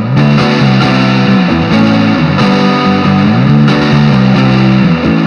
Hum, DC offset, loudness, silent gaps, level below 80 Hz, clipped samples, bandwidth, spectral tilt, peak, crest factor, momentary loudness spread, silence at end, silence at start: none; under 0.1%; -8 LUFS; none; -34 dBFS; under 0.1%; 7 kHz; -7.5 dB/octave; 0 dBFS; 8 dB; 2 LU; 0 s; 0 s